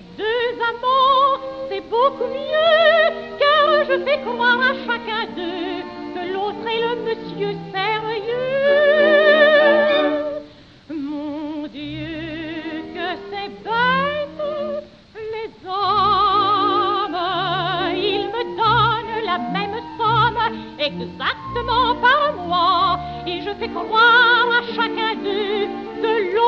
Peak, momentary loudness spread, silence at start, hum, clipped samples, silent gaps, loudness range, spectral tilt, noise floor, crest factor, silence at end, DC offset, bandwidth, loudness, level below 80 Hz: -2 dBFS; 15 LU; 0 s; none; under 0.1%; none; 8 LU; -6 dB/octave; -42 dBFS; 16 dB; 0 s; under 0.1%; 6.6 kHz; -18 LUFS; -48 dBFS